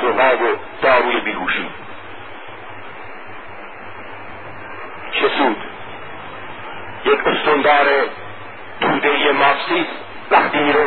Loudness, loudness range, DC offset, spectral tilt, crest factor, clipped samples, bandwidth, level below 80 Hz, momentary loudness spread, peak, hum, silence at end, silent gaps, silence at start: -16 LUFS; 12 LU; 2%; -9 dB/octave; 18 dB; under 0.1%; 4.5 kHz; -54 dBFS; 20 LU; 0 dBFS; none; 0 s; none; 0 s